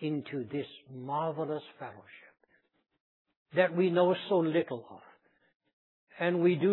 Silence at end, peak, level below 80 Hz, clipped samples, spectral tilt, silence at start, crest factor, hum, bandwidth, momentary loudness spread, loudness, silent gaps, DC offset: 0 s; -10 dBFS; -86 dBFS; under 0.1%; -5.5 dB/octave; 0 s; 22 dB; none; 4.2 kHz; 18 LU; -31 LUFS; 3.00-3.25 s, 3.37-3.46 s, 5.55-5.60 s, 5.73-6.07 s; under 0.1%